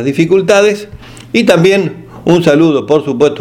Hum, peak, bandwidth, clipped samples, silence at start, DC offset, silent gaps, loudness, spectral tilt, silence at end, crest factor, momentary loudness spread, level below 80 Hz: none; 0 dBFS; 15.5 kHz; 0.3%; 0 s; under 0.1%; none; -10 LUFS; -6 dB/octave; 0 s; 10 dB; 11 LU; -44 dBFS